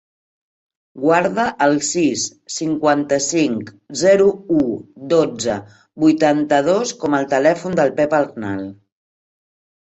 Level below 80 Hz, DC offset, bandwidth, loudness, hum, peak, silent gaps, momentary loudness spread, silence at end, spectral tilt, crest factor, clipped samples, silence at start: -58 dBFS; under 0.1%; 8.2 kHz; -17 LUFS; none; -2 dBFS; none; 10 LU; 1.1 s; -4.5 dB/octave; 16 dB; under 0.1%; 0.95 s